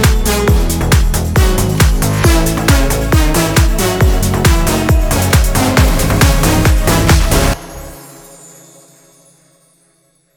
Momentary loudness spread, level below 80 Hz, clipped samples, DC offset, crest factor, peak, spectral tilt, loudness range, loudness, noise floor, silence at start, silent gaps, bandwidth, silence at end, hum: 3 LU; -16 dBFS; under 0.1%; under 0.1%; 12 dB; 0 dBFS; -4.5 dB/octave; 4 LU; -12 LUFS; -55 dBFS; 0 s; none; over 20 kHz; 2.3 s; none